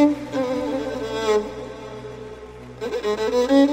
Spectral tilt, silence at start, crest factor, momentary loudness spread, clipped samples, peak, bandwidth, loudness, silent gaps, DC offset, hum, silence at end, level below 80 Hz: -5 dB/octave; 0 s; 16 dB; 18 LU; under 0.1%; -6 dBFS; 15.5 kHz; -23 LUFS; none; under 0.1%; none; 0 s; -48 dBFS